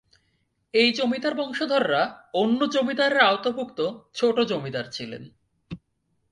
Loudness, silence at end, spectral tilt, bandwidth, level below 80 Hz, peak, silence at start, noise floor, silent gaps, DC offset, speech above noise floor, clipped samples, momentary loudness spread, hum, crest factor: -23 LUFS; 0.55 s; -4.5 dB/octave; 10.5 kHz; -64 dBFS; -4 dBFS; 0.75 s; -72 dBFS; none; under 0.1%; 49 dB; under 0.1%; 17 LU; none; 20 dB